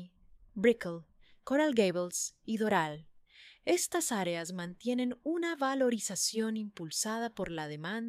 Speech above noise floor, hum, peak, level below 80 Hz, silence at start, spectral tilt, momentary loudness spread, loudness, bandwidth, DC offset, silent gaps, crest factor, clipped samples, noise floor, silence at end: 27 dB; none; -14 dBFS; -68 dBFS; 0 s; -3.5 dB/octave; 10 LU; -33 LUFS; 15.5 kHz; under 0.1%; none; 20 dB; under 0.1%; -60 dBFS; 0 s